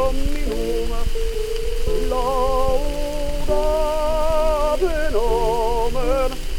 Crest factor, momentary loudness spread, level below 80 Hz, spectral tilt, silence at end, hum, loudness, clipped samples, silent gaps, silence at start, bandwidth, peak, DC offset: 12 dB; 6 LU; -22 dBFS; -5 dB/octave; 0 s; none; -22 LUFS; under 0.1%; none; 0 s; 16 kHz; -6 dBFS; under 0.1%